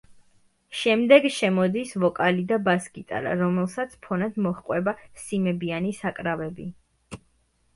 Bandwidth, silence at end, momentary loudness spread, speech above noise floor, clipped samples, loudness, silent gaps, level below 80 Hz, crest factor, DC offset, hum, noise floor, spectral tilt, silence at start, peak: 11.5 kHz; 0.6 s; 17 LU; 42 dB; under 0.1%; -24 LUFS; none; -60 dBFS; 22 dB; under 0.1%; none; -66 dBFS; -6 dB/octave; 0.7 s; -2 dBFS